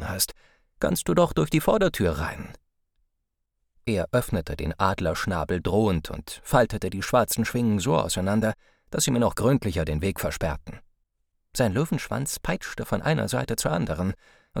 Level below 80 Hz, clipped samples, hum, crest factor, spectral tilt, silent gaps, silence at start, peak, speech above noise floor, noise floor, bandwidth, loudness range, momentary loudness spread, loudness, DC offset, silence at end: -42 dBFS; under 0.1%; none; 20 dB; -5 dB/octave; none; 0 s; -6 dBFS; 53 dB; -78 dBFS; over 20 kHz; 4 LU; 10 LU; -25 LUFS; under 0.1%; 0 s